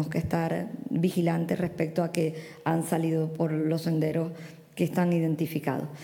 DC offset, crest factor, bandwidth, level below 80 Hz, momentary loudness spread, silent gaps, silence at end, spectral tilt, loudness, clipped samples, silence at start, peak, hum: under 0.1%; 18 dB; 17.5 kHz; -60 dBFS; 6 LU; none; 0 s; -7 dB/octave; -28 LUFS; under 0.1%; 0 s; -10 dBFS; none